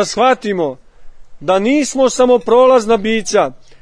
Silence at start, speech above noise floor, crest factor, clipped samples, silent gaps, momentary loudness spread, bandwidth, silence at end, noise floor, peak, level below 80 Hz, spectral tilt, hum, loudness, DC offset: 0 s; 20 dB; 12 dB; under 0.1%; none; 10 LU; 10.5 kHz; 0.25 s; -32 dBFS; 0 dBFS; -44 dBFS; -4 dB/octave; none; -13 LUFS; under 0.1%